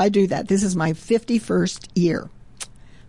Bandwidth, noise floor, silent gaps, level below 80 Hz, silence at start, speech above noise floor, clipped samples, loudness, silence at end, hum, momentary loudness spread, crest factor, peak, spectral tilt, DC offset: 11.5 kHz; -40 dBFS; none; -50 dBFS; 0 s; 19 dB; under 0.1%; -21 LUFS; 0.45 s; none; 17 LU; 14 dB; -8 dBFS; -6 dB/octave; 0.5%